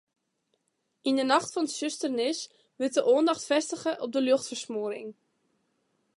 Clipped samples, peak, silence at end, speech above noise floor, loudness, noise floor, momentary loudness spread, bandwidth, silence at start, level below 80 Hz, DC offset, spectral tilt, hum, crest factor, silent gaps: under 0.1%; -8 dBFS; 1.05 s; 50 dB; -28 LUFS; -77 dBFS; 11 LU; 11.5 kHz; 1.05 s; -82 dBFS; under 0.1%; -2.5 dB/octave; none; 22 dB; none